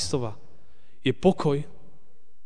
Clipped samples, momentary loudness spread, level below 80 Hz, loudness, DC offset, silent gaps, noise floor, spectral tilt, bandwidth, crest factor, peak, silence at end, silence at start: under 0.1%; 13 LU; -52 dBFS; -26 LUFS; 2%; none; -65 dBFS; -6 dB/octave; 10 kHz; 20 dB; -8 dBFS; 0.8 s; 0 s